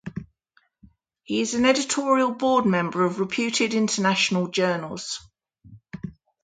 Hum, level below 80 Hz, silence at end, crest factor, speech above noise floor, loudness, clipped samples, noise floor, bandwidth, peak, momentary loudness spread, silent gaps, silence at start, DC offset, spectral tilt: none; -60 dBFS; 0.35 s; 20 dB; 43 dB; -23 LUFS; under 0.1%; -66 dBFS; 9.6 kHz; -6 dBFS; 18 LU; none; 0.05 s; under 0.1%; -4 dB/octave